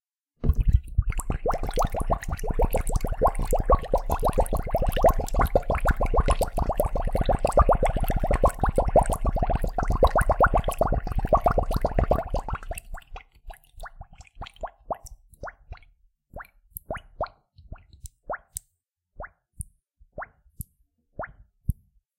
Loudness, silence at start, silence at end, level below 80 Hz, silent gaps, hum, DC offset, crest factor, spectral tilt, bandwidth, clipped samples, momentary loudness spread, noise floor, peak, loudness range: -26 LUFS; 0.4 s; 0.45 s; -28 dBFS; none; none; under 0.1%; 20 dB; -6.5 dB/octave; 17 kHz; under 0.1%; 21 LU; -77 dBFS; -6 dBFS; 17 LU